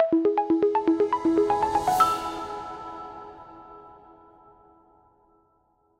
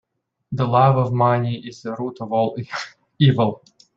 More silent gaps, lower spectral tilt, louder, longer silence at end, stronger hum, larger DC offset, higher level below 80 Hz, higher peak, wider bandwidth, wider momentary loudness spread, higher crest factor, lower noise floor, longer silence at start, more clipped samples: neither; second, -5.5 dB/octave vs -8 dB/octave; second, -24 LUFS vs -20 LUFS; first, 2.1 s vs 0.4 s; neither; neither; about the same, -56 dBFS vs -58 dBFS; second, -8 dBFS vs -2 dBFS; first, 16 kHz vs 7.4 kHz; first, 23 LU vs 15 LU; about the same, 18 dB vs 18 dB; first, -67 dBFS vs -42 dBFS; second, 0 s vs 0.5 s; neither